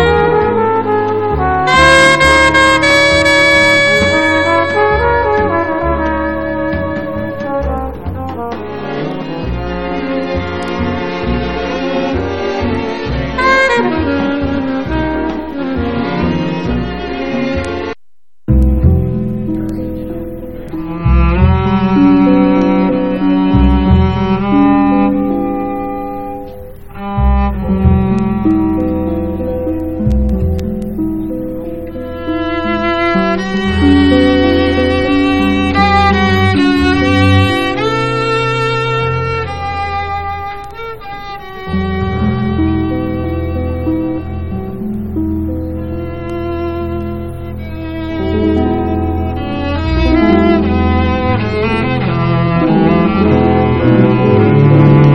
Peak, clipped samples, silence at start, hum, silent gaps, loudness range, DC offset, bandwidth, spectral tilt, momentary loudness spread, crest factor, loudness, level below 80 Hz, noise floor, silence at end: 0 dBFS; 0.1%; 0 s; none; none; 10 LU; 2%; 12 kHz; -6.5 dB/octave; 13 LU; 12 dB; -13 LUFS; -24 dBFS; -64 dBFS; 0 s